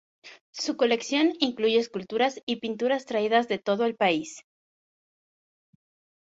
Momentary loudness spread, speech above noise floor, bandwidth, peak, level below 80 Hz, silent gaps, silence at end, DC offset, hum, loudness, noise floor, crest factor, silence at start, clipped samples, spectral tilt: 8 LU; over 64 dB; 8 kHz; -8 dBFS; -72 dBFS; 0.41-0.53 s, 2.43-2.47 s; 1.9 s; under 0.1%; none; -26 LUFS; under -90 dBFS; 20 dB; 0.25 s; under 0.1%; -3.5 dB/octave